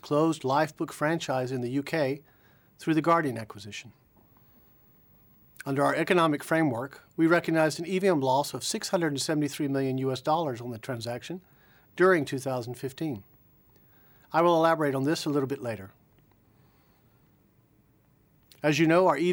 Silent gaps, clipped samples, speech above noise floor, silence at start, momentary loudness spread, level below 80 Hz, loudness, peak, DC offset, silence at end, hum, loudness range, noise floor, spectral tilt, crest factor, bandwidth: none; under 0.1%; 37 dB; 0.05 s; 14 LU; -70 dBFS; -27 LUFS; -10 dBFS; under 0.1%; 0 s; none; 6 LU; -64 dBFS; -5.5 dB/octave; 20 dB; 18.5 kHz